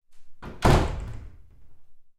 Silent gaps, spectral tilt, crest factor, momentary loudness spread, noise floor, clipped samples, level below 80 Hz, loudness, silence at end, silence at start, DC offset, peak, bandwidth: none; -6 dB/octave; 20 dB; 23 LU; -44 dBFS; under 0.1%; -32 dBFS; -24 LUFS; 0.1 s; 0.1 s; under 0.1%; -6 dBFS; 14.5 kHz